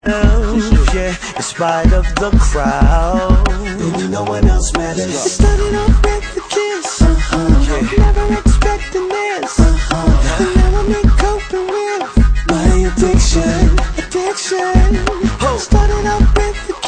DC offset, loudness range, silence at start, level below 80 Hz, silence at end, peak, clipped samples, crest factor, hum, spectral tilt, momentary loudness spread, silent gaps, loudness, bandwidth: under 0.1%; 1 LU; 0.05 s; -14 dBFS; 0 s; 0 dBFS; under 0.1%; 12 dB; none; -5.5 dB/octave; 6 LU; none; -14 LUFS; 9.6 kHz